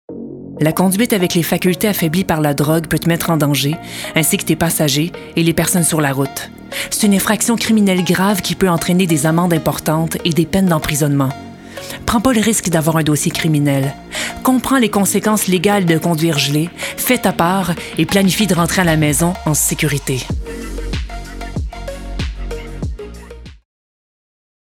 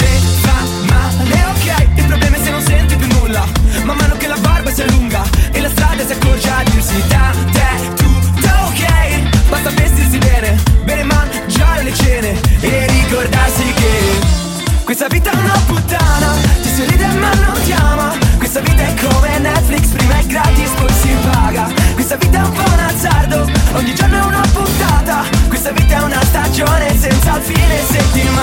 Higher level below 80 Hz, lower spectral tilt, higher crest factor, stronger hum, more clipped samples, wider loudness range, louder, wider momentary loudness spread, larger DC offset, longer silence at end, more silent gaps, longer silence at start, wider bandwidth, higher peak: second, -34 dBFS vs -14 dBFS; about the same, -4.5 dB/octave vs -5 dB/octave; first, 16 dB vs 10 dB; neither; neither; first, 6 LU vs 1 LU; second, -15 LUFS vs -12 LUFS; first, 13 LU vs 2 LU; neither; first, 1.1 s vs 0 s; neither; about the same, 0.1 s vs 0 s; first, 19 kHz vs 17 kHz; about the same, 0 dBFS vs 0 dBFS